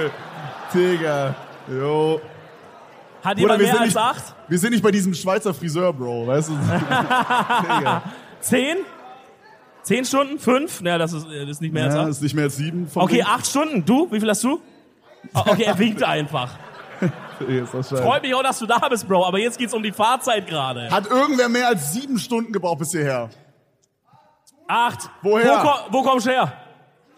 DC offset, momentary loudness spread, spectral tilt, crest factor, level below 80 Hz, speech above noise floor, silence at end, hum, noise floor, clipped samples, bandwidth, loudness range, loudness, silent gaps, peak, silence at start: under 0.1%; 10 LU; -4.5 dB/octave; 18 dB; -68 dBFS; 44 dB; 0.55 s; none; -63 dBFS; under 0.1%; 15.5 kHz; 3 LU; -20 LUFS; none; -2 dBFS; 0 s